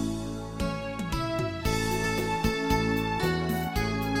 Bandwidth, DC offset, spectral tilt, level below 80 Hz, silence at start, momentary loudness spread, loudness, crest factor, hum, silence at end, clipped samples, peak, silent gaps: 17 kHz; under 0.1%; -5.5 dB/octave; -38 dBFS; 0 s; 6 LU; -29 LUFS; 18 dB; none; 0 s; under 0.1%; -10 dBFS; none